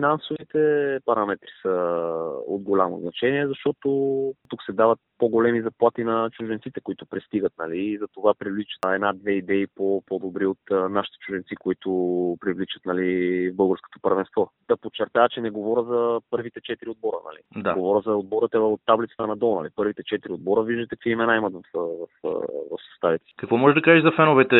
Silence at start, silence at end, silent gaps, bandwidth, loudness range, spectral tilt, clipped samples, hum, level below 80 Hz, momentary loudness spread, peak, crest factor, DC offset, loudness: 0 s; 0 s; none; 4.1 kHz; 3 LU; -4.5 dB/octave; under 0.1%; none; -66 dBFS; 9 LU; -2 dBFS; 22 dB; under 0.1%; -24 LUFS